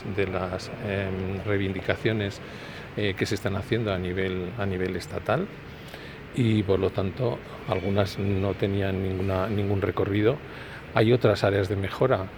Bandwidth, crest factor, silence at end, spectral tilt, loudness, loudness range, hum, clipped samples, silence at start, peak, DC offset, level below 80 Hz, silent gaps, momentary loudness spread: 18 kHz; 22 dB; 0 s; -7 dB/octave; -27 LUFS; 4 LU; none; under 0.1%; 0 s; -4 dBFS; under 0.1%; -50 dBFS; none; 12 LU